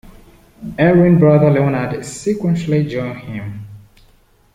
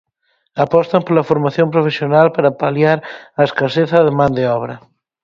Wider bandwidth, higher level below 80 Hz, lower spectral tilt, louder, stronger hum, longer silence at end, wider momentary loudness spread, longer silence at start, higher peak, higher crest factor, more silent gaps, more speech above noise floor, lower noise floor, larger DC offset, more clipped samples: first, 11 kHz vs 7.2 kHz; first, -44 dBFS vs -52 dBFS; about the same, -8 dB/octave vs -8 dB/octave; about the same, -15 LUFS vs -15 LUFS; neither; first, 0.75 s vs 0.45 s; first, 19 LU vs 8 LU; about the same, 0.6 s vs 0.55 s; about the same, -2 dBFS vs 0 dBFS; about the same, 14 dB vs 14 dB; neither; second, 37 dB vs 51 dB; second, -52 dBFS vs -65 dBFS; neither; neither